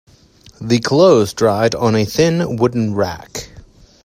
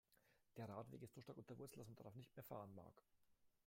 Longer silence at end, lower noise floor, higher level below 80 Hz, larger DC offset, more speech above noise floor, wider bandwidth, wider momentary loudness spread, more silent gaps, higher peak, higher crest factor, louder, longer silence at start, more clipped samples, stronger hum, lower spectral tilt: first, 0.45 s vs 0.15 s; second, -46 dBFS vs -80 dBFS; first, -46 dBFS vs -86 dBFS; neither; first, 32 dB vs 22 dB; about the same, 16 kHz vs 16.5 kHz; first, 17 LU vs 7 LU; neither; first, 0 dBFS vs -40 dBFS; about the same, 16 dB vs 20 dB; first, -15 LUFS vs -59 LUFS; first, 0.6 s vs 0.1 s; neither; neither; about the same, -5.5 dB/octave vs -6.5 dB/octave